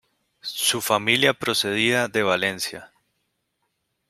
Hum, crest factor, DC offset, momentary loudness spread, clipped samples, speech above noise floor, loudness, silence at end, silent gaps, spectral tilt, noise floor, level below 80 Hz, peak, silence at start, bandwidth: none; 22 dB; under 0.1%; 12 LU; under 0.1%; 53 dB; -21 LUFS; 1.25 s; none; -2.5 dB/octave; -75 dBFS; -66 dBFS; -2 dBFS; 0.45 s; 16 kHz